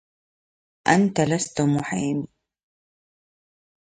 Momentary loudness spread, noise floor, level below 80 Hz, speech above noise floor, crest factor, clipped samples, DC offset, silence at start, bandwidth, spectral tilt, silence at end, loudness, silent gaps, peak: 9 LU; under -90 dBFS; -60 dBFS; over 69 dB; 22 dB; under 0.1%; under 0.1%; 0.85 s; 10 kHz; -5.5 dB/octave; 1.55 s; -22 LUFS; none; -2 dBFS